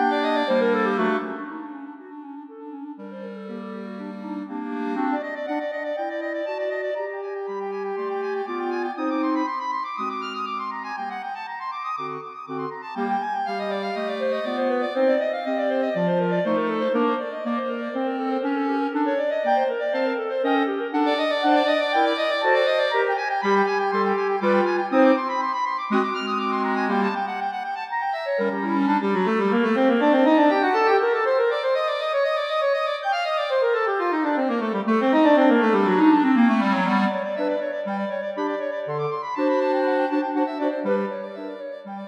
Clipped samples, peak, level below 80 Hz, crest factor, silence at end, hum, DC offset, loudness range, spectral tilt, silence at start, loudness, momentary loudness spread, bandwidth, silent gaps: under 0.1%; -6 dBFS; -84 dBFS; 18 dB; 0 s; none; under 0.1%; 9 LU; -6.5 dB/octave; 0 s; -23 LUFS; 13 LU; 9.4 kHz; none